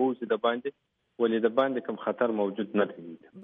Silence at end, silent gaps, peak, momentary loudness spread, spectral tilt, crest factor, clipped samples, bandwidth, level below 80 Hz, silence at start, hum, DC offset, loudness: 0 s; none; -10 dBFS; 10 LU; -4 dB/octave; 18 dB; under 0.1%; 3.9 kHz; -80 dBFS; 0 s; none; under 0.1%; -29 LUFS